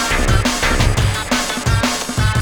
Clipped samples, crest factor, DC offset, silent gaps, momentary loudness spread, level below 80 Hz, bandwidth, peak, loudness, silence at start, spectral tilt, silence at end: under 0.1%; 16 dB; under 0.1%; none; 3 LU; -22 dBFS; 19 kHz; 0 dBFS; -16 LUFS; 0 s; -4 dB/octave; 0 s